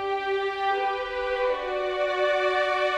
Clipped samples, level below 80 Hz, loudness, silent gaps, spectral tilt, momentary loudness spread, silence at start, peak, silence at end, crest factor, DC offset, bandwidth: under 0.1%; -54 dBFS; -26 LUFS; none; -3 dB/octave; 4 LU; 0 s; -12 dBFS; 0 s; 12 dB; under 0.1%; 10 kHz